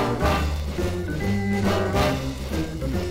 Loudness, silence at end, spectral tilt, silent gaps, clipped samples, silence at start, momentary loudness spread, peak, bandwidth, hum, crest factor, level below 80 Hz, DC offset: -25 LUFS; 0 s; -6 dB/octave; none; under 0.1%; 0 s; 6 LU; -10 dBFS; 16 kHz; none; 14 dB; -32 dBFS; under 0.1%